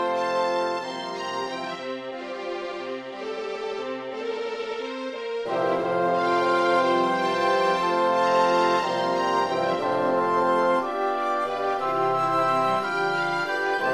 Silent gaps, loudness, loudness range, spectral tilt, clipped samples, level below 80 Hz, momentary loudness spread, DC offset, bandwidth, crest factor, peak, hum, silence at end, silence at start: none; -25 LUFS; 10 LU; -4.5 dB/octave; under 0.1%; -66 dBFS; 11 LU; under 0.1%; 12.5 kHz; 16 dB; -8 dBFS; none; 0 s; 0 s